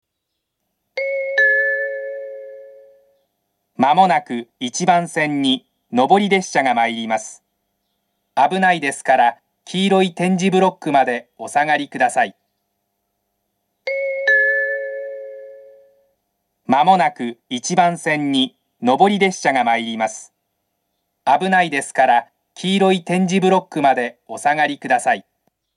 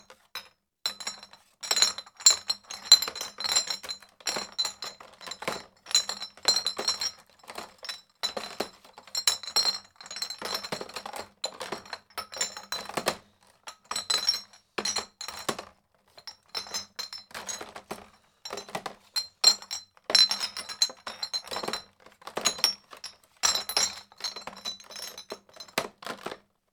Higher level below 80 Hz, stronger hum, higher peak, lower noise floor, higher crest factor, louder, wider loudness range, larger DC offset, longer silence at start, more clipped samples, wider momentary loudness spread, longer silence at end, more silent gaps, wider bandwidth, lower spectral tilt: second, -76 dBFS vs -70 dBFS; neither; about the same, 0 dBFS vs 0 dBFS; first, -77 dBFS vs -61 dBFS; second, 18 dB vs 32 dB; first, -17 LUFS vs -28 LUFS; second, 4 LU vs 11 LU; neither; first, 0.95 s vs 0.1 s; neither; second, 12 LU vs 21 LU; first, 0.55 s vs 0.35 s; neither; second, 12 kHz vs 19.5 kHz; first, -4.5 dB/octave vs 1 dB/octave